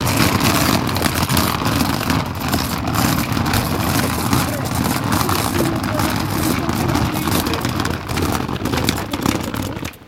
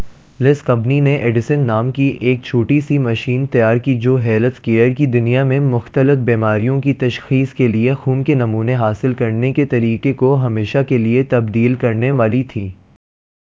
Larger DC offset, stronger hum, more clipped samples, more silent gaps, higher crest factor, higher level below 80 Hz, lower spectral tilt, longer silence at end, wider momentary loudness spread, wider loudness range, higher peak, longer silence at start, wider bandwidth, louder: neither; neither; neither; neither; about the same, 18 dB vs 14 dB; first, -34 dBFS vs -46 dBFS; second, -4.5 dB/octave vs -9 dB/octave; second, 0 s vs 0.85 s; about the same, 5 LU vs 3 LU; about the same, 2 LU vs 1 LU; about the same, 0 dBFS vs 0 dBFS; about the same, 0 s vs 0 s; first, 17 kHz vs 7.4 kHz; second, -18 LUFS vs -15 LUFS